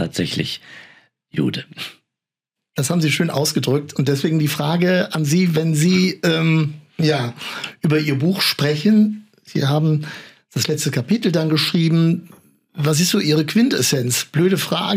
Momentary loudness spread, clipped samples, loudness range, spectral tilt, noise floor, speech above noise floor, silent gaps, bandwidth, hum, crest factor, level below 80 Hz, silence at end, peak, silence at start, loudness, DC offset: 11 LU; under 0.1%; 4 LU; -5 dB/octave; -86 dBFS; 68 dB; none; 16 kHz; none; 14 dB; -64 dBFS; 0 s; -6 dBFS; 0 s; -18 LUFS; under 0.1%